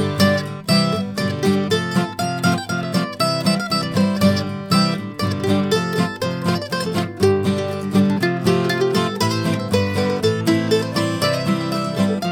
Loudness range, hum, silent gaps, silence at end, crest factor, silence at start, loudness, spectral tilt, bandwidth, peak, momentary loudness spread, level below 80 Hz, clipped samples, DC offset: 1 LU; none; none; 0 s; 18 dB; 0 s; -19 LUFS; -5.5 dB/octave; 18.5 kHz; -2 dBFS; 5 LU; -56 dBFS; under 0.1%; under 0.1%